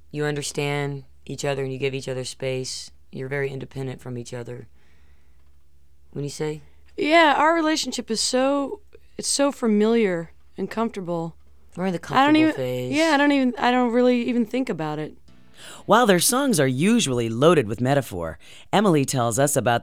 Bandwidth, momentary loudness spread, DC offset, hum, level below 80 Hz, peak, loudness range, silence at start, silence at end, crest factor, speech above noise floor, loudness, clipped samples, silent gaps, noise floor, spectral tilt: 16.5 kHz; 17 LU; 0.5%; none; -56 dBFS; -2 dBFS; 12 LU; 0.15 s; 0 s; 20 dB; 37 dB; -22 LUFS; under 0.1%; none; -58 dBFS; -4.5 dB/octave